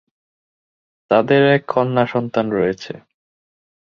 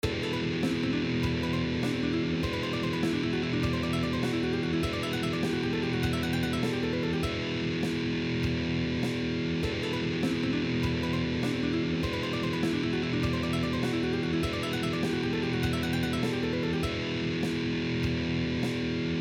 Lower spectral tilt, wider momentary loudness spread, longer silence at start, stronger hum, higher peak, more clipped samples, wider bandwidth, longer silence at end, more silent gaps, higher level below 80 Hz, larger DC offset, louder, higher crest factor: first, -7.5 dB/octave vs -6 dB/octave; first, 15 LU vs 1 LU; first, 1.1 s vs 0.05 s; neither; first, -2 dBFS vs -16 dBFS; neither; second, 7 kHz vs 18.5 kHz; first, 0.95 s vs 0 s; neither; second, -58 dBFS vs -46 dBFS; neither; first, -17 LUFS vs -30 LUFS; about the same, 18 dB vs 14 dB